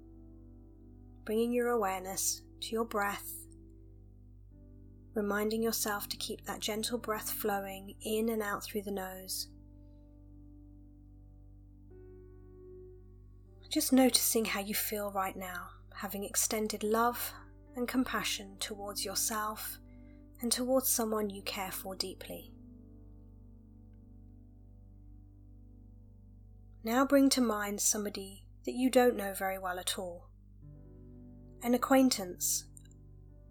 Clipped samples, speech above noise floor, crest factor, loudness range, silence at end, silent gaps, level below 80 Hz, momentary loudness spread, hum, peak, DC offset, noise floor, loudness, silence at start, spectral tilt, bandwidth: under 0.1%; 22 dB; 24 dB; 10 LU; 0.15 s; none; -56 dBFS; 22 LU; 50 Hz at -65 dBFS; -12 dBFS; under 0.1%; -55 dBFS; -33 LUFS; 0 s; -2.5 dB/octave; 19 kHz